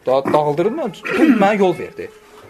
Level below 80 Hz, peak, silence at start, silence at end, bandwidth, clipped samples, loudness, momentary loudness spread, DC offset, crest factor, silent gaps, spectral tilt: -60 dBFS; 0 dBFS; 0.05 s; 0.1 s; 13.5 kHz; under 0.1%; -16 LUFS; 17 LU; under 0.1%; 16 dB; none; -6.5 dB/octave